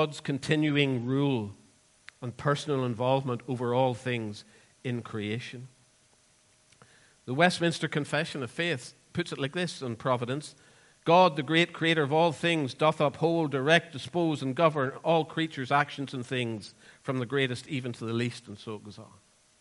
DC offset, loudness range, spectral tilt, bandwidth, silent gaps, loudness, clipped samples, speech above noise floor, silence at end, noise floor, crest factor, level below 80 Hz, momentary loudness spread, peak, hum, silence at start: under 0.1%; 8 LU; -5.5 dB/octave; 11.5 kHz; none; -28 LUFS; under 0.1%; 36 dB; 0.55 s; -64 dBFS; 22 dB; -70 dBFS; 16 LU; -6 dBFS; none; 0 s